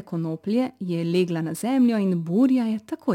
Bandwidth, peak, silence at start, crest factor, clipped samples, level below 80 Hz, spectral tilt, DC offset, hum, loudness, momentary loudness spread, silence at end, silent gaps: 16 kHz; -10 dBFS; 0 s; 14 dB; under 0.1%; -74 dBFS; -7 dB/octave; under 0.1%; none; -23 LUFS; 8 LU; 0 s; none